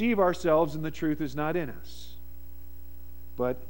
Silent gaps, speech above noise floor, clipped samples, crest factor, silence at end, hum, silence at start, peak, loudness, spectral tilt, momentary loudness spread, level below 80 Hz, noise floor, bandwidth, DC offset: none; 20 dB; under 0.1%; 18 dB; 0 s; 60 Hz at -50 dBFS; 0 s; -12 dBFS; -28 LUFS; -7 dB/octave; 24 LU; -48 dBFS; -48 dBFS; 16.5 kHz; 1%